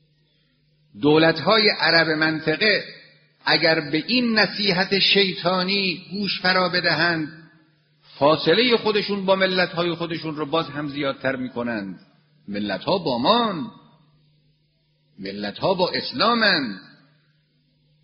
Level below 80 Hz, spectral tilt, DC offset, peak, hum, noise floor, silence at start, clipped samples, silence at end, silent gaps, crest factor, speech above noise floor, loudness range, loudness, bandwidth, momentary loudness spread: -62 dBFS; -2 dB/octave; under 0.1%; -2 dBFS; none; -65 dBFS; 0.95 s; under 0.1%; 1.2 s; none; 20 dB; 44 dB; 7 LU; -20 LUFS; 6.4 kHz; 12 LU